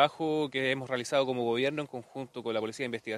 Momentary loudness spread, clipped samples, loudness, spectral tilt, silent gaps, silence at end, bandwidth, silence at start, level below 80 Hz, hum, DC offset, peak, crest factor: 10 LU; under 0.1%; -31 LUFS; -4.5 dB/octave; none; 0 s; 14 kHz; 0 s; -76 dBFS; none; under 0.1%; -8 dBFS; 22 dB